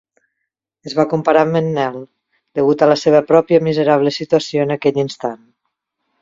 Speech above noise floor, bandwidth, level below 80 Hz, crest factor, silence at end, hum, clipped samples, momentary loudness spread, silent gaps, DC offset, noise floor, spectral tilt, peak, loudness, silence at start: 62 dB; 7.6 kHz; -60 dBFS; 16 dB; 0.85 s; none; under 0.1%; 12 LU; none; under 0.1%; -77 dBFS; -6.5 dB/octave; 0 dBFS; -15 LUFS; 0.85 s